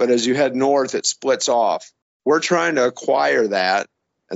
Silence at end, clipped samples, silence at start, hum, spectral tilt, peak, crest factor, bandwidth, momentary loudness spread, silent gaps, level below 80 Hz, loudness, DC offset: 0 s; under 0.1%; 0 s; none; -2 dB/octave; -6 dBFS; 14 dB; 8 kHz; 5 LU; 2.02-2.20 s; -70 dBFS; -18 LUFS; under 0.1%